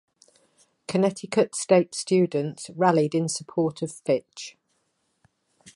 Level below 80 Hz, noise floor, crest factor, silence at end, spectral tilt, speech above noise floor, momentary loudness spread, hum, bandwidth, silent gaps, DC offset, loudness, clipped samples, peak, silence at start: -72 dBFS; -73 dBFS; 20 dB; 1.25 s; -5.5 dB/octave; 49 dB; 12 LU; none; 11.5 kHz; none; under 0.1%; -24 LUFS; under 0.1%; -6 dBFS; 0.9 s